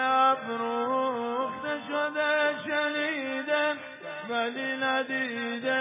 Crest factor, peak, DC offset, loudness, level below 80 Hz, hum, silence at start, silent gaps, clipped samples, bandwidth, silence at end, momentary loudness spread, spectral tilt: 16 dB; -12 dBFS; under 0.1%; -28 LUFS; -78 dBFS; none; 0 s; none; under 0.1%; 3.9 kHz; 0 s; 6 LU; -0.5 dB/octave